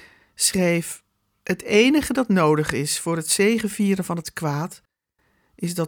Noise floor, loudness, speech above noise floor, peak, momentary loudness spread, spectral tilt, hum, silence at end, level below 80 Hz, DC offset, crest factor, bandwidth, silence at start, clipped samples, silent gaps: -69 dBFS; -21 LUFS; 48 dB; -4 dBFS; 12 LU; -4 dB/octave; none; 0 s; -54 dBFS; under 0.1%; 18 dB; over 20 kHz; 0.4 s; under 0.1%; none